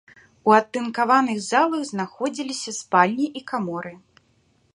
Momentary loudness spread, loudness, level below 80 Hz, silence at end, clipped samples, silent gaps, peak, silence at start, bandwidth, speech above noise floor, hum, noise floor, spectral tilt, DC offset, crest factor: 11 LU; -22 LUFS; -70 dBFS; 0.75 s; under 0.1%; none; -2 dBFS; 0.45 s; 11.5 kHz; 41 dB; none; -63 dBFS; -4 dB/octave; under 0.1%; 22 dB